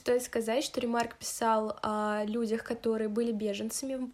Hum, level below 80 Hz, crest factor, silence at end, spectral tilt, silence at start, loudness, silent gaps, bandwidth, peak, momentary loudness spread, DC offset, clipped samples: none; -66 dBFS; 16 dB; 0 s; -4 dB/octave; 0.05 s; -32 LUFS; none; 15.5 kHz; -16 dBFS; 5 LU; under 0.1%; under 0.1%